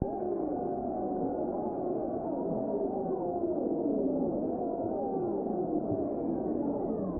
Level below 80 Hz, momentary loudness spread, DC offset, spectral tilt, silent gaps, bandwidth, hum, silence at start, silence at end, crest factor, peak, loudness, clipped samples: -56 dBFS; 3 LU; under 0.1%; -9 dB/octave; none; 2.1 kHz; none; 0 s; 0 s; 16 dB; -14 dBFS; -33 LUFS; under 0.1%